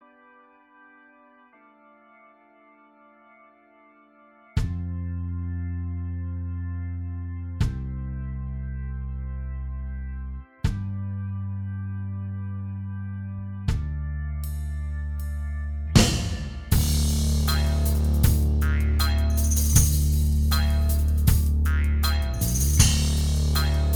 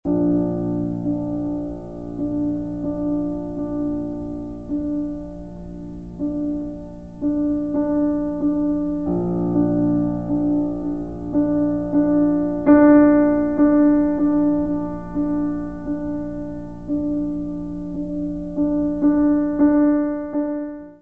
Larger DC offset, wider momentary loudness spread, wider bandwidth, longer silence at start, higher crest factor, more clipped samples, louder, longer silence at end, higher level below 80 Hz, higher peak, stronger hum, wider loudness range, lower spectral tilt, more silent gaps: second, under 0.1% vs 0.7%; about the same, 13 LU vs 13 LU; first, over 20 kHz vs 2.5 kHz; first, 4.55 s vs 0 s; about the same, 22 dB vs 18 dB; neither; second, -26 LUFS vs -21 LUFS; about the same, 0 s vs 0 s; first, -26 dBFS vs -42 dBFS; about the same, -2 dBFS vs -2 dBFS; neither; about the same, 11 LU vs 10 LU; second, -4.5 dB/octave vs -11 dB/octave; neither